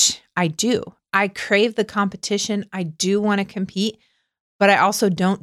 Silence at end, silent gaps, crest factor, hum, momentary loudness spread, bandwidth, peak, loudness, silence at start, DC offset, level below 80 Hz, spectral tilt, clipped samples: 0.05 s; 4.40-4.59 s; 18 dB; none; 8 LU; 15 kHz; -4 dBFS; -20 LUFS; 0 s; under 0.1%; -62 dBFS; -3.5 dB/octave; under 0.1%